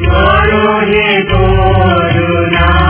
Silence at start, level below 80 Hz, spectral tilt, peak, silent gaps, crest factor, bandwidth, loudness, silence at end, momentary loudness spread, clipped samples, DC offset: 0 s; -16 dBFS; -10 dB/octave; 0 dBFS; none; 8 dB; 4 kHz; -9 LUFS; 0 s; 3 LU; 0.7%; under 0.1%